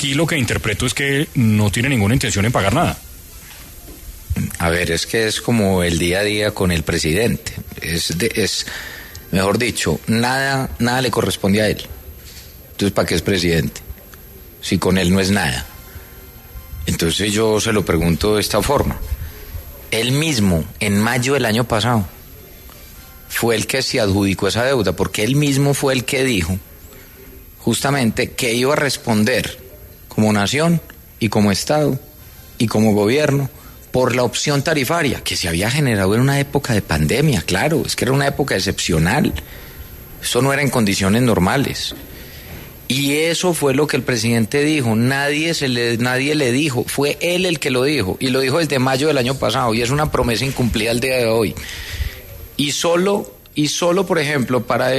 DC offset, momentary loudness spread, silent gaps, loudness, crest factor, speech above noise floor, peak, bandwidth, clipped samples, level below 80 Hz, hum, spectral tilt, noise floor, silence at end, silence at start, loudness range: under 0.1%; 14 LU; none; -17 LUFS; 16 dB; 22 dB; -2 dBFS; 13.5 kHz; under 0.1%; -36 dBFS; none; -4.5 dB/octave; -39 dBFS; 0 s; 0 s; 2 LU